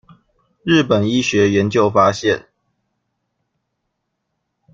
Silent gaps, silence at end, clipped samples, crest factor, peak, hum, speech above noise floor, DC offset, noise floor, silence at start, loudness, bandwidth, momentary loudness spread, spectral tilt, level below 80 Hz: none; 2.35 s; under 0.1%; 18 dB; -2 dBFS; none; 59 dB; under 0.1%; -74 dBFS; 0.65 s; -16 LUFS; 7.8 kHz; 6 LU; -5.5 dB/octave; -54 dBFS